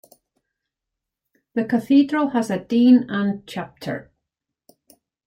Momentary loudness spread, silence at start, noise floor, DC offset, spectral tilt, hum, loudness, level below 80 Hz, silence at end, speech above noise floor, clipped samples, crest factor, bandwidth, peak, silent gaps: 16 LU; 1.55 s; -84 dBFS; under 0.1%; -6.5 dB/octave; none; -20 LUFS; -66 dBFS; 1.25 s; 65 dB; under 0.1%; 18 dB; 11.5 kHz; -4 dBFS; none